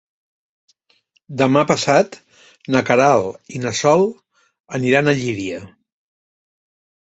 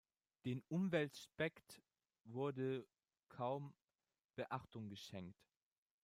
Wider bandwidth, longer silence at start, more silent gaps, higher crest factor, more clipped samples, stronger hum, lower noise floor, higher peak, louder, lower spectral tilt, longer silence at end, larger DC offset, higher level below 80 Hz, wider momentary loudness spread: second, 8.2 kHz vs 15.5 kHz; first, 1.3 s vs 0.45 s; about the same, 4.60-4.64 s vs 3.84-3.88 s, 4.24-4.29 s; about the same, 18 dB vs 22 dB; neither; neither; second, -62 dBFS vs under -90 dBFS; first, 0 dBFS vs -26 dBFS; first, -17 LUFS vs -46 LUFS; second, -5 dB/octave vs -6.5 dB/octave; first, 1.45 s vs 0.7 s; neither; first, -58 dBFS vs -84 dBFS; second, 14 LU vs 17 LU